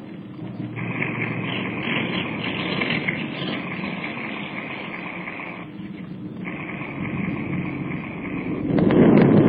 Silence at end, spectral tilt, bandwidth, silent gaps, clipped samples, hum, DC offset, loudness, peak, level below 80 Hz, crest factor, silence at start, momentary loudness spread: 0 s; -10 dB/octave; 5 kHz; none; under 0.1%; none; under 0.1%; -24 LUFS; -2 dBFS; -52 dBFS; 22 dB; 0 s; 14 LU